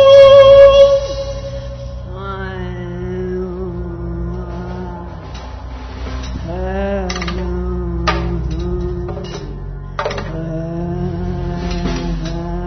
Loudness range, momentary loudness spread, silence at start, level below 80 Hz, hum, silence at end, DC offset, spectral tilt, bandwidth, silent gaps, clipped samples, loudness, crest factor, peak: 12 LU; 21 LU; 0 s; -26 dBFS; none; 0 s; under 0.1%; -6.5 dB/octave; 6.4 kHz; none; 0.2%; -15 LUFS; 14 dB; 0 dBFS